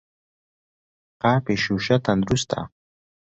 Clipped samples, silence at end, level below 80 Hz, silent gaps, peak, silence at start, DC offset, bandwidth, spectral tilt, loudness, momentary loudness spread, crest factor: under 0.1%; 0.6 s; -50 dBFS; none; -4 dBFS; 1.25 s; under 0.1%; 8.2 kHz; -5.5 dB/octave; -22 LUFS; 8 LU; 20 dB